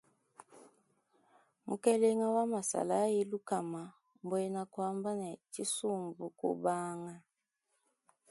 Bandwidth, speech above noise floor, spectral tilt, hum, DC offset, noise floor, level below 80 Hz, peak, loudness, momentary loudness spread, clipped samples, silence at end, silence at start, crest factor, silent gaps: 11.5 kHz; 49 dB; -5 dB/octave; none; under 0.1%; -84 dBFS; -84 dBFS; -16 dBFS; -35 LUFS; 14 LU; under 0.1%; 1.1 s; 0.55 s; 20 dB; none